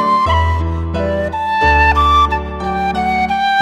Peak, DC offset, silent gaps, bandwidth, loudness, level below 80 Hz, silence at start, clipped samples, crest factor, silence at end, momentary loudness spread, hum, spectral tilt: -2 dBFS; under 0.1%; none; 9.8 kHz; -14 LUFS; -24 dBFS; 0 s; under 0.1%; 12 dB; 0 s; 8 LU; none; -6 dB/octave